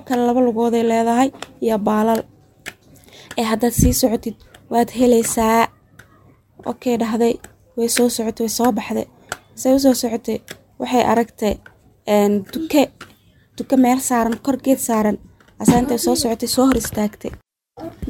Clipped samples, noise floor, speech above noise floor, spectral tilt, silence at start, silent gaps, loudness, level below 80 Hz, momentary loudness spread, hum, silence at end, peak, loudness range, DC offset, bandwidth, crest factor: under 0.1%; -51 dBFS; 34 dB; -4.5 dB/octave; 0.05 s; none; -18 LUFS; -38 dBFS; 16 LU; none; 0 s; 0 dBFS; 2 LU; under 0.1%; 17 kHz; 18 dB